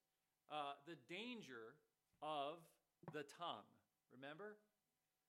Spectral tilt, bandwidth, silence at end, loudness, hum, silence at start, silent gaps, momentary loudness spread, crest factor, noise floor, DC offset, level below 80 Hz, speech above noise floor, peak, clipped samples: -4.5 dB/octave; 15.5 kHz; 0.7 s; -54 LUFS; none; 0.5 s; none; 12 LU; 20 dB; under -90 dBFS; under 0.1%; under -90 dBFS; over 36 dB; -36 dBFS; under 0.1%